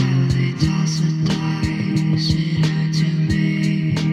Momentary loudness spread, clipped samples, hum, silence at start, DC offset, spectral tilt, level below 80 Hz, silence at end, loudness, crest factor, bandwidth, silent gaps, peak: 2 LU; under 0.1%; none; 0 s; under 0.1%; -6.5 dB/octave; -38 dBFS; 0 s; -19 LUFS; 12 dB; 9.4 kHz; none; -6 dBFS